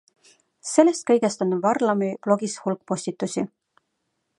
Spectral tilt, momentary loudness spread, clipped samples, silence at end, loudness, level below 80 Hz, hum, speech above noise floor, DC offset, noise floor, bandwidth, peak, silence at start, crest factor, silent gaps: -5 dB/octave; 10 LU; under 0.1%; 0.9 s; -23 LUFS; -74 dBFS; none; 54 dB; under 0.1%; -76 dBFS; 11.5 kHz; -2 dBFS; 0.65 s; 22 dB; none